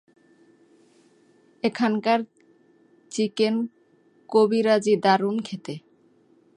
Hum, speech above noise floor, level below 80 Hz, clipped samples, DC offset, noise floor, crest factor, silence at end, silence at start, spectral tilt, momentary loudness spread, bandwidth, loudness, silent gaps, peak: none; 38 dB; -76 dBFS; under 0.1%; under 0.1%; -60 dBFS; 20 dB; 0.8 s; 1.65 s; -5.5 dB/octave; 15 LU; 11 kHz; -23 LUFS; none; -6 dBFS